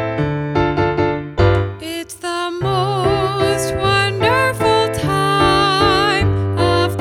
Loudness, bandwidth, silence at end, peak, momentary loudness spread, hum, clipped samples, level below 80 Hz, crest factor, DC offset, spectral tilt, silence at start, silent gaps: -16 LUFS; 16 kHz; 0 s; -2 dBFS; 8 LU; none; under 0.1%; -34 dBFS; 14 dB; under 0.1%; -5.5 dB/octave; 0 s; none